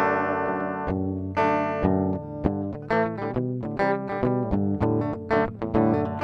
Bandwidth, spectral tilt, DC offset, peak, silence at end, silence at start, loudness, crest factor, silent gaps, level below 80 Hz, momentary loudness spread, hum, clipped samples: 6.6 kHz; -9 dB/octave; under 0.1%; -4 dBFS; 0 s; 0 s; -25 LUFS; 20 dB; none; -44 dBFS; 5 LU; none; under 0.1%